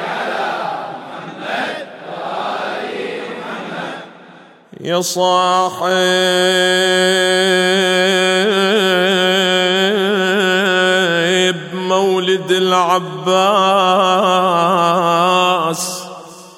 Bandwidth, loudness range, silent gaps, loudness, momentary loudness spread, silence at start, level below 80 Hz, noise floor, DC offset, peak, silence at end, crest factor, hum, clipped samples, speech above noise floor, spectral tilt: 16 kHz; 11 LU; none; -14 LUFS; 13 LU; 0 s; -68 dBFS; -42 dBFS; under 0.1%; 0 dBFS; 0.05 s; 14 dB; none; under 0.1%; 28 dB; -3.5 dB/octave